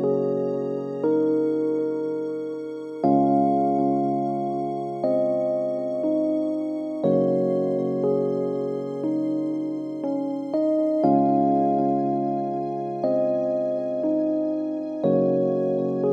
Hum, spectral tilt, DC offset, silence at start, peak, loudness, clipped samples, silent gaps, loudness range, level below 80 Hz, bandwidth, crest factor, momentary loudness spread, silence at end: none; -10 dB/octave; under 0.1%; 0 s; -8 dBFS; -24 LUFS; under 0.1%; none; 2 LU; -80 dBFS; 7.6 kHz; 16 dB; 8 LU; 0 s